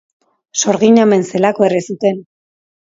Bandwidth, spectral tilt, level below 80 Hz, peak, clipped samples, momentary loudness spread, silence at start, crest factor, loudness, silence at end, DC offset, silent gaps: 7.8 kHz; -4.5 dB/octave; -62 dBFS; 0 dBFS; under 0.1%; 9 LU; 0.55 s; 14 dB; -13 LUFS; 0.65 s; under 0.1%; none